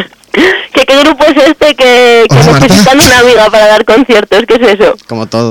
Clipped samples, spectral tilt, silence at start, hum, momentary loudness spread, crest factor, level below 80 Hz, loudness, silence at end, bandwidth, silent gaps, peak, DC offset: 0.4%; -4.5 dB/octave; 0 s; none; 6 LU; 4 dB; -32 dBFS; -4 LUFS; 0 s; over 20 kHz; none; 0 dBFS; under 0.1%